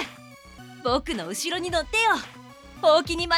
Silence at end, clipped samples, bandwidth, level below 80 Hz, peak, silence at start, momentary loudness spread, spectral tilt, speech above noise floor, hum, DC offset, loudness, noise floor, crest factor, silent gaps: 0 s; under 0.1%; 16.5 kHz; -46 dBFS; -8 dBFS; 0 s; 14 LU; -3 dB/octave; 23 dB; none; under 0.1%; -24 LUFS; -46 dBFS; 18 dB; none